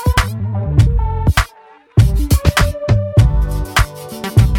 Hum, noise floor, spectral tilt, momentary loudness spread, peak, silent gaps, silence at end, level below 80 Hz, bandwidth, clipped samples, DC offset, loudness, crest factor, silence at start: none; -44 dBFS; -5.5 dB/octave; 7 LU; 0 dBFS; none; 0 s; -18 dBFS; 18 kHz; under 0.1%; under 0.1%; -15 LUFS; 14 dB; 0 s